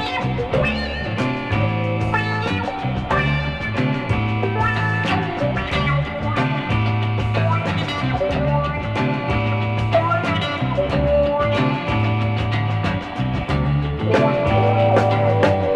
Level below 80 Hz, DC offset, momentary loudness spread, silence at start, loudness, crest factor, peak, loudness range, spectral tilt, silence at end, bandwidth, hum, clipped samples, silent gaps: -34 dBFS; under 0.1%; 5 LU; 0 s; -20 LUFS; 16 dB; -4 dBFS; 2 LU; -7.5 dB/octave; 0 s; 8.6 kHz; none; under 0.1%; none